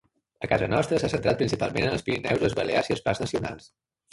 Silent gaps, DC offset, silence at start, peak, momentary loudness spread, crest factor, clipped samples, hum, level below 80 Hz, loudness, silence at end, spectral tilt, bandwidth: none; under 0.1%; 0.4 s; -8 dBFS; 7 LU; 20 dB; under 0.1%; none; -48 dBFS; -26 LUFS; 0.45 s; -5.5 dB/octave; 11.5 kHz